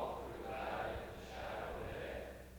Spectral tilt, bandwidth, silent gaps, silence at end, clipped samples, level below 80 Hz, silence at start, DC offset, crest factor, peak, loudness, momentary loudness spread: -5.5 dB/octave; over 20 kHz; none; 0 s; under 0.1%; -56 dBFS; 0 s; under 0.1%; 16 dB; -30 dBFS; -45 LUFS; 6 LU